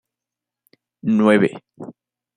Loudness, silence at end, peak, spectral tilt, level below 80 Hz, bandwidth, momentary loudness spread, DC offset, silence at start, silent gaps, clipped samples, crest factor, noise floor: -18 LUFS; 0.45 s; -2 dBFS; -7 dB/octave; -68 dBFS; 10 kHz; 24 LU; under 0.1%; 1.05 s; none; under 0.1%; 20 dB; -87 dBFS